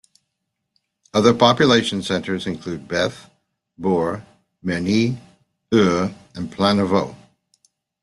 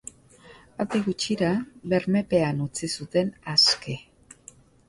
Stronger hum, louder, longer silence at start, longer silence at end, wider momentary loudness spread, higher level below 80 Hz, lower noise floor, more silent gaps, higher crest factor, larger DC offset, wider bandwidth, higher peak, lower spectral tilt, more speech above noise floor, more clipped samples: neither; first, -19 LUFS vs -24 LUFS; first, 1.15 s vs 0.5 s; about the same, 0.85 s vs 0.9 s; about the same, 16 LU vs 15 LU; about the same, -56 dBFS vs -58 dBFS; first, -77 dBFS vs -52 dBFS; neither; about the same, 20 dB vs 20 dB; neither; about the same, 12 kHz vs 11.5 kHz; first, -2 dBFS vs -6 dBFS; about the same, -5.5 dB/octave vs -4.5 dB/octave; first, 59 dB vs 27 dB; neither